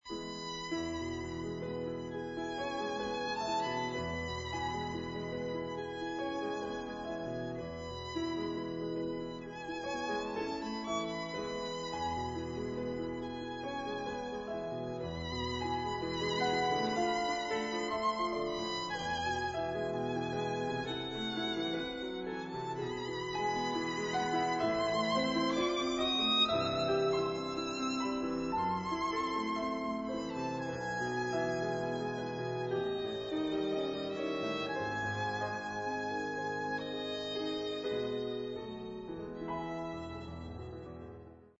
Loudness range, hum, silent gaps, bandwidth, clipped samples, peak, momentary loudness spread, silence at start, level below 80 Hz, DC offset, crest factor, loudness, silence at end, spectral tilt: 7 LU; none; none; 7.6 kHz; under 0.1%; -18 dBFS; 9 LU; 0.05 s; -58 dBFS; under 0.1%; 18 dB; -36 LUFS; 0.1 s; -3 dB/octave